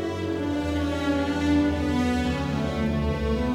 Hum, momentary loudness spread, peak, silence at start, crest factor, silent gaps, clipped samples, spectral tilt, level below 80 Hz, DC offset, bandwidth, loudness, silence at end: none; 4 LU; -12 dBFS; 0 s; 12 dB; none; under 0.1%; -6.5 dB/octave; -38 dBFS; under 0.1%; 13.5 kHz; -25 LUFS; 0 s